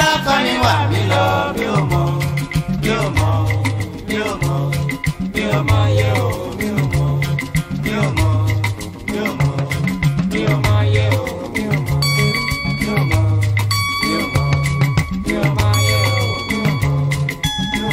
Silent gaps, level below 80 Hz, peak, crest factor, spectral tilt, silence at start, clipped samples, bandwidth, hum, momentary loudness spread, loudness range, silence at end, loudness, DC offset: none; -32 dBFS; -2 dBFS; 16 dB; -5.5 dB/octave; 0 s; under 0.1%; 16 kHz; none; 6 LU; 2 LU; 0 s; -17 LUFS; under 0.1%